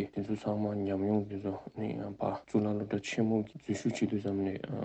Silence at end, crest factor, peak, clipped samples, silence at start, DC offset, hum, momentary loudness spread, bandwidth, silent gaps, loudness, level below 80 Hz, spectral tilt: 0 s; 18 dB; -16 dBFS; under 0.1%; 0 s; under 0.1%; none; 7 LU; 8.6 kHz; none; -34 LUFS; -68 dBFS; -7 dB/octave